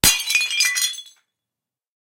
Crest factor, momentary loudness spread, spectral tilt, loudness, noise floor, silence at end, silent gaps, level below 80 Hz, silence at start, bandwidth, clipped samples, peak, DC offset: 22 dB; 9 LU; 0.5 dB/octave; -18 LUFS; -88 dBFS; 1.1 s; none; -46 dBFS; 0.05 s; 17 kHz; under 0.1%; 0 dBFS; under 0.1%